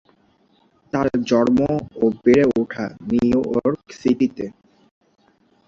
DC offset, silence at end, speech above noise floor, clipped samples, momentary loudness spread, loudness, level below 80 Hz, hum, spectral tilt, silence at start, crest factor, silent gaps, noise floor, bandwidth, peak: under 0.1%; 1.2 s; 41 dB; under 0.1%; 11 LU; -19 LUFS; -50 dBFS; none; -7 dB/octave; 0.95 s; 18 dB; none; -59 dBFS; 7.4 kHz; -2 dBFS